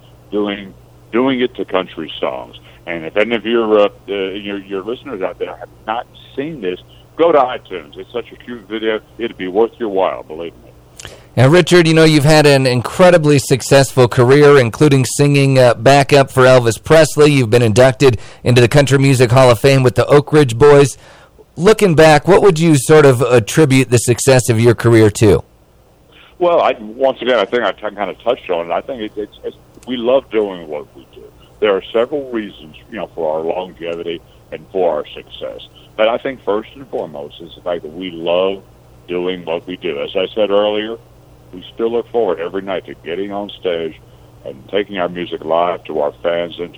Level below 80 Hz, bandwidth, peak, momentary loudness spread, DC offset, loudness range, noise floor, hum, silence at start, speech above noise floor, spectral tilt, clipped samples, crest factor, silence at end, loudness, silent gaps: -40 dBFS; 16 kHz; 0 dBFS; 18 LU; under 0.1%; 11 LU; -48 dBFS; none; 0.3 s; 35 dB; -5.5 dB/octave; under 0.1%; 14 dB; 0.05 s; -13 LUFS; none